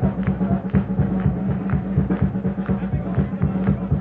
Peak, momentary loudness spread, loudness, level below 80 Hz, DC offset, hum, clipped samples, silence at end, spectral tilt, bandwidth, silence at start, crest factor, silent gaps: -6 dBFS; 3 LU; -22 LUFS; -34 dBFS; under 0.1%; none; under 0.1%; 0 s; -12.5 dB/octave; 3.7 kHz; 0 s; 16 dB; none